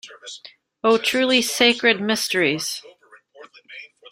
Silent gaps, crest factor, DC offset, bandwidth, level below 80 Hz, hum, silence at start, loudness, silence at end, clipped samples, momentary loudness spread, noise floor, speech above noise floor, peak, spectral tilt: none; 20 dB; under 0.1%; 16 kHz; -66 dBFS; none; 0.05 s; -19 LUFS; 0.05 s; under 0.1%; 23 LU; -51 dBFS; 30 dB; -2 dBFS; -2.5 dB/octave